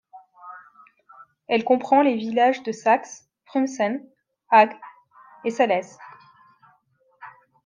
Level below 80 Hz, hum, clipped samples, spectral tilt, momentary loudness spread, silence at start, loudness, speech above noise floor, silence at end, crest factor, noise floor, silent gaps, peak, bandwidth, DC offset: -78 dBFS; none; under 0.1%; -4.5 dB/octave; 25 LU; 0.15 s; -21 LUFS; 43 dB; 0.35 s; 20 dB; -64 dBFS; none; -4 dBFS; 9.6 kHz; under 0.1%